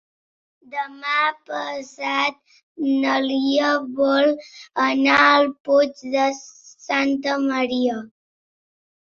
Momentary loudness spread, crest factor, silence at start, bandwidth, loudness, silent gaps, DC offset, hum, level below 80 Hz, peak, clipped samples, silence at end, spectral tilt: 14 LU; 20 dB; 0.7 s; 7.4 kHz; -20 LUFS; 2.63-2.75 s, 5.60-5.64 s; under 0.1%; none; -66 dBFS; -2 dBFS; under 0.1%; 1.1 s; -3 dB/octave